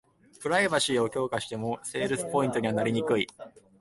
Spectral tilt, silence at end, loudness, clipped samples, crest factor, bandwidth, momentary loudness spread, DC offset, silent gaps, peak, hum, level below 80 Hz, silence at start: -4 dB/octave; 0.2 s; -28 LUFS; under 0.1%; 18 dB; 11.5 kHz; 8 LU; under 0.1%; none; -12 dBFS; none; -64 dBFS; 0.4 s